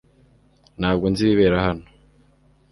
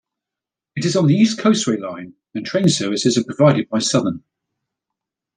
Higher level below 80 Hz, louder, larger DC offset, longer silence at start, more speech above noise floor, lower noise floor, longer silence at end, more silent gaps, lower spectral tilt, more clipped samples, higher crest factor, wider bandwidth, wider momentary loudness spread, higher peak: first, -42 dBFS vs -62 dBFS; second, -20 LUFS vs -17 LUFS; neither; about the same, 0.8 s vs 0.75 s; second, 38 dB vs 69 dB; second, -57 dBFS vs -86 dBFS; second, 0.9 s vs 1.2 s; neither; first, -7 dB/octave vs -5 dB/octave; neither; about the same, 18 dB vs 16 dB; first, 11.5 kHz vs 10 kHz; second, 9 LU vs 16 LU; about the same, -4 dBFS vs -2 dBFS